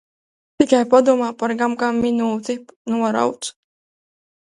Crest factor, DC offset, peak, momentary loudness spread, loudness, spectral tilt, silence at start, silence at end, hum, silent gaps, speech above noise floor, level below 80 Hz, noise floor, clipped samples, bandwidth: 20 dB; under 0.1%; 0 dBFS; 14 LU; -19 LUFS; -4.5 dB/octave; 0.6 s; 0.95 s; none; 2.76-2.85 s; over 72 dB; -58 dBFS; under -90 dBFS; under 0.1%; 11.5 kHz